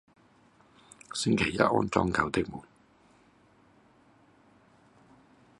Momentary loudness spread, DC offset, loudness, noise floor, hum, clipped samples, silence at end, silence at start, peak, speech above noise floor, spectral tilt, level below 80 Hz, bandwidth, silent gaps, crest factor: 13 LU; under 0.1%; -28 LUFS; -62 dBFS; none; under 0.1%; 3 s; 1.1 s; -6 dBFS; 34 dB; -5 dB/octave; -54 dBFS; 11.5 kHz; none; 28 dB